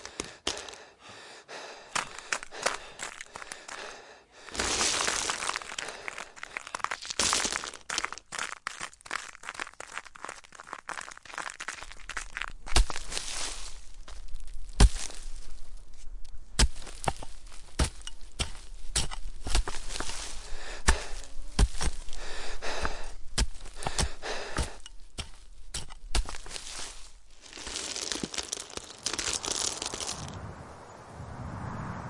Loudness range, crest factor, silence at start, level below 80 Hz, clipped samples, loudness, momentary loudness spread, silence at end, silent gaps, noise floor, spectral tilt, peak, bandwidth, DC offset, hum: 6 LU; 26 dB; 0 s; -36 dBFS; under 0.1%; -33 LUFS; 19 LU; 0 s; none; -51 dBFS; -2 dB/octave; -6 dBFS; 11.5 kHz; under 0.1%; none